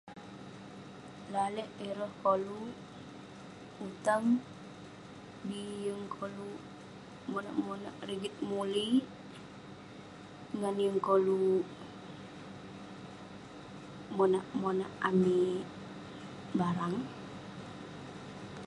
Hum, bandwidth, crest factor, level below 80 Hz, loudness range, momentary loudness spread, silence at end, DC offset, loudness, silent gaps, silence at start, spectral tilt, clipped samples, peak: none; 11.5 kHz; 20 dB; -70 dBFS; 6 LU; 20 LU; 0 s; under 0.1%; -34 LUFS; none; 0.05 s; -6.5 dB/octave; under 0.1%; -16 dBFS